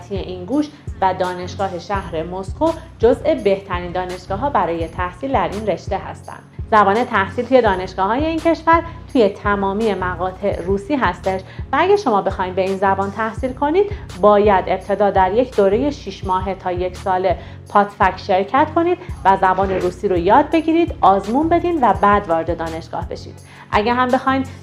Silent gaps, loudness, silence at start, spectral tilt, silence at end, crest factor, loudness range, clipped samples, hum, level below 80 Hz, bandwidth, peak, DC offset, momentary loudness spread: none; -18 LUFS; 0 s; -6.5 dB/octave; 0 s; 18 dB; 4 LU; under 0.1%; none; -36 dBFS; 12 kHz; 0 dBFS; under 0.1%; 10 LU